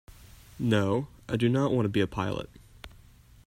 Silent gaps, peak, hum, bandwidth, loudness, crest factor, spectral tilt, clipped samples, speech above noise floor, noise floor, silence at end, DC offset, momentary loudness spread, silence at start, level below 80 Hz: none; -12 dBFS; none; 16 kHz; -28 LUFS; 18 dB; -7 dB/octave; under 0.1%; 27 dB; -54 dBFS; 0.6 s; under 0.1%; 24 LU; 0.55 s; -54 dBFS